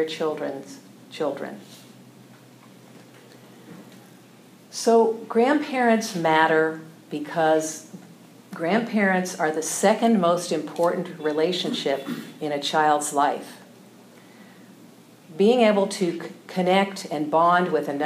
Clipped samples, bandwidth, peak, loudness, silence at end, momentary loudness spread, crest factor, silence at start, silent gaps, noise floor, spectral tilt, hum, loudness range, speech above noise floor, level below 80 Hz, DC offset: under 0.1%; 15.5 kHz; -4 dBFS; -23 LUFS; 0 s; 16 LU; 20 dB; 0 s; none; -50 dBFS; -4.5 dB/octave; none; 11 LU; 27 dB; -88 dBFS; under 0.1%